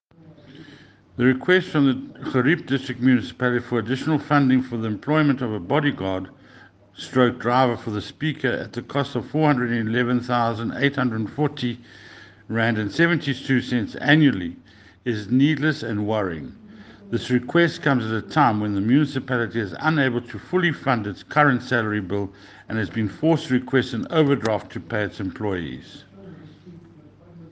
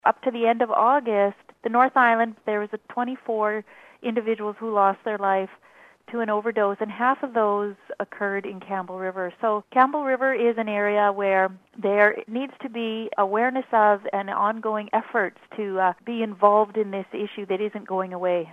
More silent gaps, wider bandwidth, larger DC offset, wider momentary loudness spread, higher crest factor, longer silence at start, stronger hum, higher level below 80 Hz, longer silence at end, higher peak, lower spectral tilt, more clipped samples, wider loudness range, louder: neither; first, 8.8 kHz vs 5.4 kHz; neither; about the same, 10 LU vs 11 LU; about the same, 20 dB vs 22 dB; first, 0.25 s vs 0.05 s; neither; first, -60 dBFS vs -80 dBFS; about the same, 0 s vs 0 s; about the same, -2 dBFS vs -2 dBFS; about the same, -7 dB/octave vs -7.5 dB/octave; neither; about the same, 3 LU vs 4 LU; about the same, -22 LUFS vs -24 LUFS